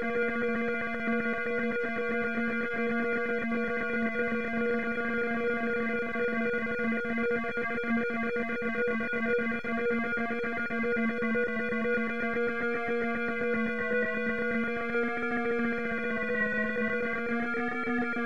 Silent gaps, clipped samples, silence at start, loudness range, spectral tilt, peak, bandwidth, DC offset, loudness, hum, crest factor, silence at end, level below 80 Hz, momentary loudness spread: none; under 0.1%; 0 s; 0 LU; -7 dB/octave; -18 dBFS; 7.6 kHz; 0.9%; -30 LUFS; none; 12 dB; 0 s; -60 dBFS; 2 LU